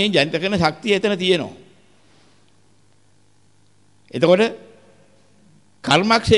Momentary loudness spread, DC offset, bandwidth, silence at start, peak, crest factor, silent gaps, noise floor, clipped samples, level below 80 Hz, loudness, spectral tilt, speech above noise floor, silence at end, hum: 16 LU; 0.2%; 11.5 kHz; 0 s; -2 dBFS; 18 dB; none; -59 dBFS; under 0.1%; -48 dBFS; -18 LUFS; -5 dB/octave; 41 dB; 0 s; none